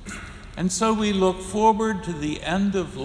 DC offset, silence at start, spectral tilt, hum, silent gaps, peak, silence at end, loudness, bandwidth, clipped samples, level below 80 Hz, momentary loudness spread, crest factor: under 0.1%; 0 s; -5 dB/octave; none; none; -6 dBFS; 0 s; -23 LUFS; 11 kHz; under 0.1%; -44 dBFS; 12 LU; 16 dB